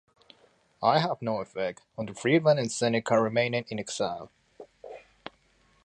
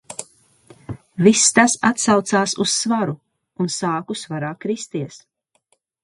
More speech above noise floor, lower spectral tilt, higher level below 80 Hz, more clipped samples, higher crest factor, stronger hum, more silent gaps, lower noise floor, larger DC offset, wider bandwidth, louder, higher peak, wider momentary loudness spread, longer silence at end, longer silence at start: second, 38 dB vs 47 dB; first, -5 dB/octave vs -3.5 dB/octave; second, -68 dBFS vs -60 dBFS; neither; about the same, 20 dB vs 20 dB; neither; neither; about the same, -65 dBFS vs -66 dBFS; neither; about the same, 11 kHz vs 11.5 kHz; second, -27 LUFS vs -18 LUFS; second, -8 dBFS vs 0 dBFS; first, 23 LU vs 20 LU; about the same, 0.85 s vs 0.85 s; first, 0.8 s vs 0.1 s